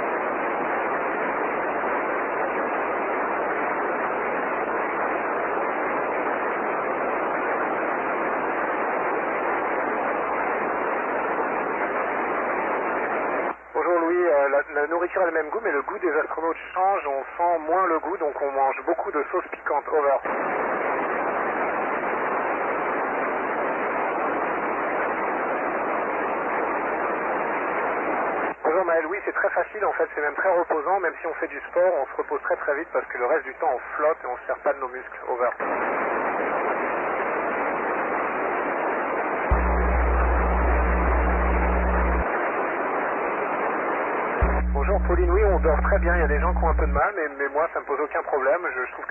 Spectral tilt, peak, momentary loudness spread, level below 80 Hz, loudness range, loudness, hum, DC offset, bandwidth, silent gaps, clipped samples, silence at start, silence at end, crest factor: -10 dB/octave; -10 dBFS; 4 LU; -32 dBFS; 3 LU; -24 LUFS; none; under 0.1%; 3.2 kHz; none; under 0.1%; 0 s; 0 s; 14 dB